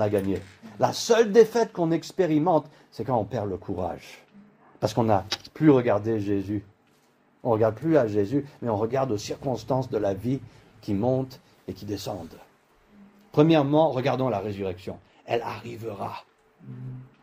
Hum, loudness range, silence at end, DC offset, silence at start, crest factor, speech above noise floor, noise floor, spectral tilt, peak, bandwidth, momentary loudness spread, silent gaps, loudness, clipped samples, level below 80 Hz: none; 6 LU; 0.15 s; under 0.1%; 0 s; 22 dB; 38 dB; -63 dBFS; -6.5 dB/octave; -4 dBFS; 16 kHz; 19 LU; none; -25 LUFS; under 0.1%; -60 dBFS